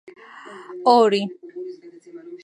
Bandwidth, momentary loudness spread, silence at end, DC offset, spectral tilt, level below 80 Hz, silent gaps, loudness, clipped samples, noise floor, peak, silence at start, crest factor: 11 kHz; 26 LU; 0.1 s; under 0.1%; -5.5 dB/octave; -80 dBFS; none; -18 LUFS; under 0.1%; -41 dBFS; -2 dBFS; 0.45 s; 20 dB